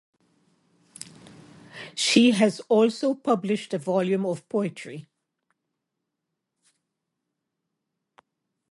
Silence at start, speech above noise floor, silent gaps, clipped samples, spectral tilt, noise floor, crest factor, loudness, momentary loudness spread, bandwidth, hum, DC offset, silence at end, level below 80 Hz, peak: 1.75 s; 60 dB; none; under 0.1%; -4.5 dB/octave; -83 dBFS; 22 dB; -23 LUFS; 24 LU; 11.5 kHz; none; under 0.1%; 3.7 s; -76 dBFS; -4 dBFS